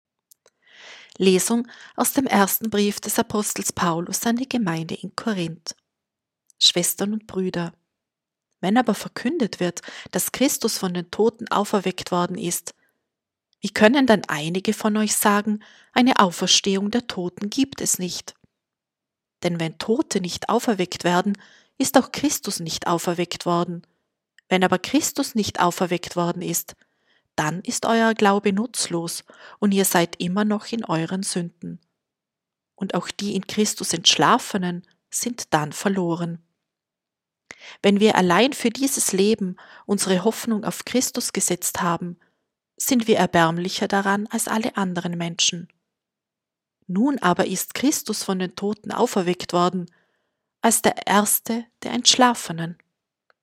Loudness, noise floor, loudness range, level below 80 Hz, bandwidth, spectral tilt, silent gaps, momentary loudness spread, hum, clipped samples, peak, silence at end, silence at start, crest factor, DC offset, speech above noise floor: -22 LUFS; -87 dBFS; 5 LU; -62 dBFS; 16.5 kHz; -3.5 dB/octave; none; 12 LU; none; under 0.1%; 0 dBFS; 0.7 s; 0.8 s; 22 dB; under 0.1%; 65 dB